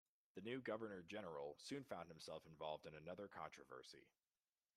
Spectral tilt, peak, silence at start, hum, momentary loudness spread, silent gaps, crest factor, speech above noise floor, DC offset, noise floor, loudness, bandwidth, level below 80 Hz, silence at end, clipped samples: -5 dB/octave; -34 dBFS; 0.35 s; none; 10 LU; none; 20 dB; over 37 dB; under 0.1%; under -90 dBFS; -54 LUFS; 14.5 kHz; -86 dBFS; 0.7 s; under 0.1%